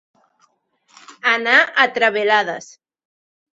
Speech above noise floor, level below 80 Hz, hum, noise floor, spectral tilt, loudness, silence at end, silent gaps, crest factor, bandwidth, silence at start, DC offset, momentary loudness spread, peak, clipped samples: 45 dB; -72 dBFS; none; -62 dBFS; -2 dB/octave; -16 LUFS; 0.95 s; none; 20 dB; 8 kHz; 1.1 s; under 0.1%; 10 LU; 0 dBFS; under 0.1%